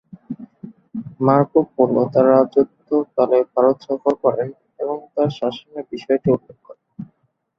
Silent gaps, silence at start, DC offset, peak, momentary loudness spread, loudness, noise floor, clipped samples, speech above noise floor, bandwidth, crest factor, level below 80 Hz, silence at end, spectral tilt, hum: none; 0.3 s; under 0.1%; 0 dBFS; 19 LU; -18 LUFS; -64 dBFS; under 0.1%; 47 dB; 6.2 kHz; 18 dB; -60 dBFS; 0.55 s; -9 dB/octave; none